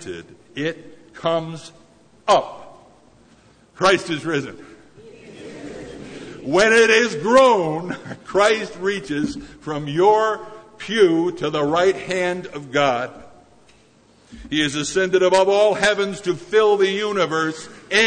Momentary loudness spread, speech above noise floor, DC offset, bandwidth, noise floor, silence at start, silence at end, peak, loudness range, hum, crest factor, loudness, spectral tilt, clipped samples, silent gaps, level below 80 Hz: 20 LU; 35 dB; under 0.1%; 9.6 kHz; -53 dBFS; 0 s; 0 s; -2 dBFS; 8 LU; none; 18 dB; -19 LUFS; -4 dB/octave; under 0.1%; none; -54 dBFS